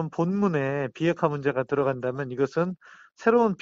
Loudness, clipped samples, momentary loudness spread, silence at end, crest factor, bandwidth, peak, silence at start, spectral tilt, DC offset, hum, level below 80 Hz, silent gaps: -26 LUFS; under 0.1%; 7 LU; 0.05 s; 18 dB; 7.6 kHz; -6 dBFS; 0 s; -8 dB/octave; under 0.1%; none; -64 dBFS; none